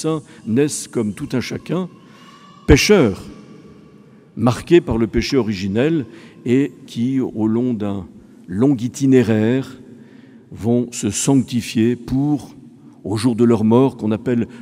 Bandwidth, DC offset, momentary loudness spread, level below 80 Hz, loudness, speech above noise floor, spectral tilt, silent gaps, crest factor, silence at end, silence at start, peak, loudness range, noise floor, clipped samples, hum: 15.5 kHz; under 0.1%; 12 LU; -38 dBFS; -18 LUFS; 28 dB; -6 dB/octave; none; 18 dB; 0 s; 0 s; 0 dBFS; 3 LU; -45 dBFS; under 0.1%; none